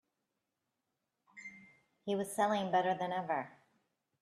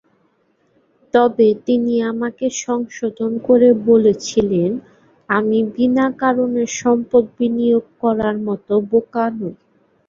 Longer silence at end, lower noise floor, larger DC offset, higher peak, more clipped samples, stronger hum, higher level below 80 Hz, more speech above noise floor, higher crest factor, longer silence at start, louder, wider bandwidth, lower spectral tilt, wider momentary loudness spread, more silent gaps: first, 0.75 s vs 0.55 s; first, -87 dBFS vs -61 dBFS; neither; second, -20 dBFS vs -2 dBFS; neither; neither; second, -84 dBFS vs -56 dBFS; first, 53 dB vs 45 dB; about the same, 20 dB vs 16 dB; first, 1.35 s vs 1.15 s; second, -35 LUFS vs -17 LUFS; first, 13 kHz vs 7.6 kHz; about the same, -5 dB/octave vs -5.5 dB/octave; first, 19 LU vs 9 LU; neither